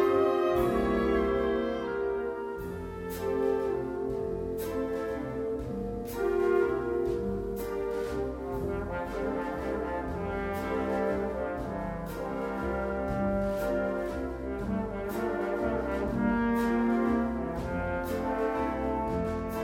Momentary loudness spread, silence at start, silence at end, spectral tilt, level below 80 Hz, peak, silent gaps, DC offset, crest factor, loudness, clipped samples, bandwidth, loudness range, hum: 8 LU; 0 s; 0 s; -7.5 dB/octave; -44 dBFS; -14 dBFS; none; under 0.1%; 16 dB; -31 LUFS; under 0.1%; 16 kHz; 3 LU; none